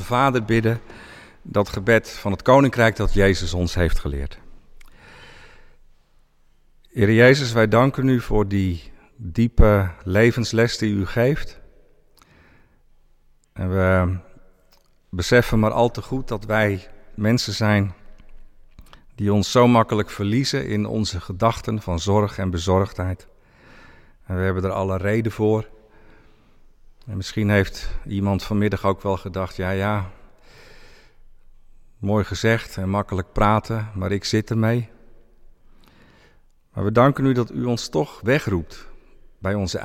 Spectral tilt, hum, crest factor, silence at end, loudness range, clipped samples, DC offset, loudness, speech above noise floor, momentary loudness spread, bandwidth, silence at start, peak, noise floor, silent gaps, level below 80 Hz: -6 dB/octave; none; 18 dB; 0 s; 7 LU; under 0.1%; under 0.1%; -21 LUFS; 36 dB; 13 LU; 15.5 kHz; 0 s; -4 dBFS; -56 dBFS; none; -34 dBFS